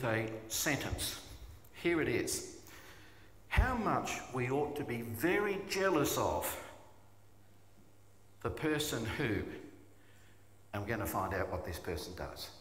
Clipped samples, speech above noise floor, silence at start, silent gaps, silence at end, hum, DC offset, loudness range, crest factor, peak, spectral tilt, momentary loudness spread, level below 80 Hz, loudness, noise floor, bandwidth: under 0.1%; 29 dB; 0 s; none; 0 s; none; under 0.1%; 6 LU; 20 dB; -16 dBFS; -4.5 dB/octave; 18 LU; -50 dBFS; -36 LUFS; -64 dBFS; 16 kHz